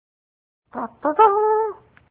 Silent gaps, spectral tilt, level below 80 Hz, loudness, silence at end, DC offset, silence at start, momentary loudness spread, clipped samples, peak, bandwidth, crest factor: none; -8 dB/octave; -64 dBFS; -19 LUFS; 0.35 s; under 0.1%; 0.75 s; 17 LU; under 0.1%; -2 dBFS; 3.8 kHz; 18 dB